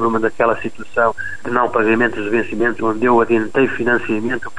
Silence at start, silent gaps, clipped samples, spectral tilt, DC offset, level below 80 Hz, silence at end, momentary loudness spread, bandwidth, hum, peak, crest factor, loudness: 0 s; none; under 0.1%; -6.5 dB/octave; 4%; -46 dBFS; 0.1 s; 6 LU; 10.5 kHz; none; -2 dBFS; 14 dB; -17 LUFS